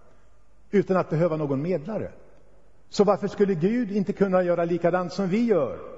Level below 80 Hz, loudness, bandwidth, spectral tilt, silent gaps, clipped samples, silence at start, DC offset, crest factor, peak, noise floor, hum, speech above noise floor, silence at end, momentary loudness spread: -58 dBFS; -24 LUFS; 8 kHz; -7.5 dB/octave; none; under 0.1%; 0.75 s; 0.4%; 18 dB; -6 dBFS; -59 dBFS; none; 35 dB; 0 s; 6 LU